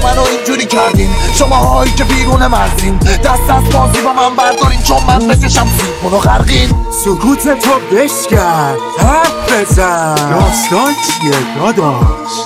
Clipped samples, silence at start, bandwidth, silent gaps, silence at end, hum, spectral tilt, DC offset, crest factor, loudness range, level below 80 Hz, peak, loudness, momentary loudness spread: under 0.1%; 0 s; 16.5 kHz; none; 0 s; none; -4.5 dB/octave; under 0.1%; 10 dB; 1 LU; -16 dBFS; 0 dBFS; -10 LUFS; 3 LU